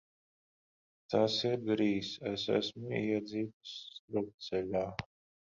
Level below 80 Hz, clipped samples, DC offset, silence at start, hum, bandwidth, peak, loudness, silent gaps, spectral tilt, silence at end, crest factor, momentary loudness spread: -68 dBFS; under 0.1%; under 0.1%; 1.1 s; none; 7.6 kHz; -16 dBFS; -35 LUFS; 3.53-3.61 s, 3.99-4.08 s, 4.34-4.38 s; -5.5 dB/octave; 0.5 s; 20 dB; 13 LU